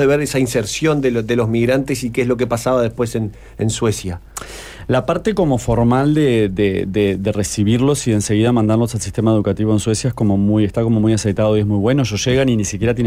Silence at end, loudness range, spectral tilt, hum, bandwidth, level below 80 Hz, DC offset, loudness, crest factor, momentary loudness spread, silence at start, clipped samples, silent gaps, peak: 0 s; 4 LU; -6 dB/octave; none; 16 kHz; -38 dBFS; under 0.1%; -17 LUFS; 12 dB; 6 LU; 0 s; under 0.1%; none; -4 dBFS